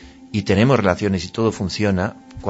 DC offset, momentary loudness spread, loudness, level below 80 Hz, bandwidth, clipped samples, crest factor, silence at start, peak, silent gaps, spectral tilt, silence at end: under 0.1%; 10 LU; -19 LUFS; -46 dBFS; 8 kHz; under 0.1%; 18 dB; 0 s; -2 dBFS; none; -6.5 dB/octave; 0 s